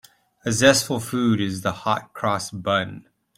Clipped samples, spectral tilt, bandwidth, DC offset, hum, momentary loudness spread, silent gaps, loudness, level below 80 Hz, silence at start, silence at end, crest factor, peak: under 0.1%; -4 dB/octave; 16.5 kHz; under 0.1%; none; 9 LU; none; -22 LUFS; -56 dBFS; 0.45 s; 0.4 s; 20 dB; -2 dBFS